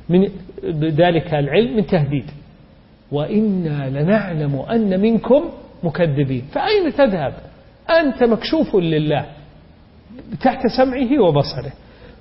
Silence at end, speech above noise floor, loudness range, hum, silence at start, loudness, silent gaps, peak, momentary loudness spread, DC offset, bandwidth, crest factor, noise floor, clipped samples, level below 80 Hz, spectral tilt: 0.1 s; 30 dB; 2 LU; none; 0 s; -18 LUFS; none; -4 dBFS; 11 LU; under 0.1%; 5.8 kHz; 14 dB; -47 dBFS; under 0.1%; -44 dBFS; -11 dB/octave